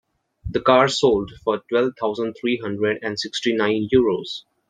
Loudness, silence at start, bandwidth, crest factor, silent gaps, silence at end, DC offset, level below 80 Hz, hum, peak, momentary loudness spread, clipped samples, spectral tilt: -21 LUFS; 0.45 s; 9.4 kHz; 20 dB; none; 0.3 s; under 0.1%; -48 dBFS; none; -2 dBFS; 9 LU; under 0.1%; -5 dB/octave